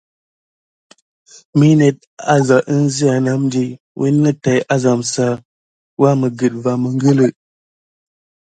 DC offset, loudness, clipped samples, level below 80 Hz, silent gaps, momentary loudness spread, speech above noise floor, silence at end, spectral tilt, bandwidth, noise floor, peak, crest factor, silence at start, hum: under 0.1%; -15 LUFS; under 0.1%; -58 dBFS; 2.07-2.17 s, 3.80-3.95 s, 5.45-5.97 s; 8 LU; over 76 dB; 1.15 s; -6.5 dB/octave; 9.4 kHz; under -90 dBFS; 0 dBFS; 16 dB; 1.55 s; none